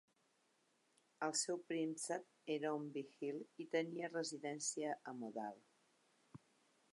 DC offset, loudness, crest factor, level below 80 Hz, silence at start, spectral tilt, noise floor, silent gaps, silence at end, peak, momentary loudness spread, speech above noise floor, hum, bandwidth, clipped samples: under 0.1%; -44 LUFS; 20 dB; under -90 dBFS; 1.2 s; -3 dB/octave; -80 dBFS; none; 0.55 s; -26 dBFS; 10 LU; 35 dB; none; 11.5 kHz; under 0.1%